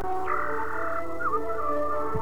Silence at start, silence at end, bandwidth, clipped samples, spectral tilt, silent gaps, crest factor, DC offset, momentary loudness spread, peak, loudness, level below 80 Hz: 0 s; 0 s; 19 kHz; under 0.1%; -7 dB/octave; none; 14 dB; 4%; 2 LU; -14 dBFS; -29 LUFS; -52 dBFS